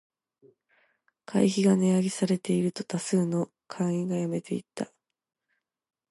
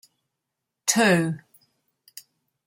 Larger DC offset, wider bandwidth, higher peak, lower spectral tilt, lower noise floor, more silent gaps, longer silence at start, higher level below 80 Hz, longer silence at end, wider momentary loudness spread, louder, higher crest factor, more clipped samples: neither; second, 11.5 kHz vs 16.5 kHz; second, -10 dBFS vs -6 dBFS; first, -6.5 dB/octave vs -3.5 dB/octave; about the same, -80 dBFS vs -83 dBFS; neither; first, 1.3 s vs 0.85 s; about the same, -74 dBFS vs -70 dBFS; about the same, 1.25 s vs 1.3 s; second, 13 LU vs 26 LU; second, -28 LUFS vs -22 LUFS; about the same, 18 dB vs 22 dB; neither